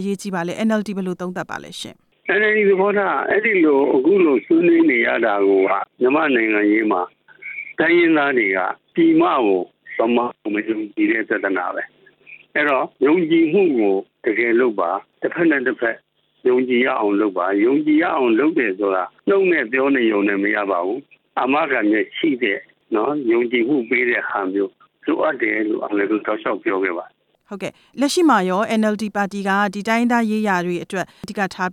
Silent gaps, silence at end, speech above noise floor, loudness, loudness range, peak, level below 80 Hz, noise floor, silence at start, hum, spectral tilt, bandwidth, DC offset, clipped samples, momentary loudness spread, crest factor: none; 0 s; 27 dB; -18 LUFS; 5 LU; -4 dBFS; -68 dBFS; -45 dBFS; 0 s; none; -5.5 dB/octave; 12 kHz; under 0.1%; under 0.1%; 12 LU; 14 dB